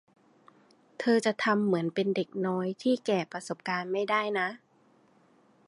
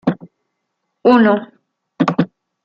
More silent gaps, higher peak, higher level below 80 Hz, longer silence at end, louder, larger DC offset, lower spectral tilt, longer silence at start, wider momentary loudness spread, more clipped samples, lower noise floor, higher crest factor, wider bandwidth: neither; second, -12 dBFS vs -2 dBFS; second, -80 dBFS vs -60 dBFS; first, 1.1 s vs 0.4 s; second, -29 LUFS vs -16 LUFS; neither; second, -5.5 dB/octave vs -8 dB/octave; first, 1 s vs 0.05 s; second, 7 LU vs 12 LU; neither; second, -64 dBFS vs -73 dBFS; about the same, 20 dB vs 16 dB; first, 11.5 kHz vs 7.2 kHz